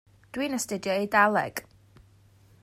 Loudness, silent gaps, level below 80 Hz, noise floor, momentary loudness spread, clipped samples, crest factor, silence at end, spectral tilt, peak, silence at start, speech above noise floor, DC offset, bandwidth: -26 LUFS; none; -64 dBFS; -58 dBFS; 15 LU; under 0.1%; 20 dB; 1 s; -3.5 dB/octave; -8 dBFS; 0.35 s; 32 dB; under 0.1%; 16 kHz